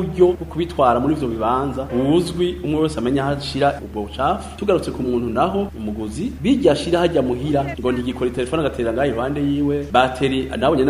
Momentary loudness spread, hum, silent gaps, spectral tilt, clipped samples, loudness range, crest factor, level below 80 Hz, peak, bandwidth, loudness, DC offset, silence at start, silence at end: 6 LU; none; none; -6.5 dB/octave; under 0.1%; 2 LU; 18 dB; -36 dBFS; 0 dBFS; 15 kHz; -20 LUFS; under 0.1%; 0 s; 0 s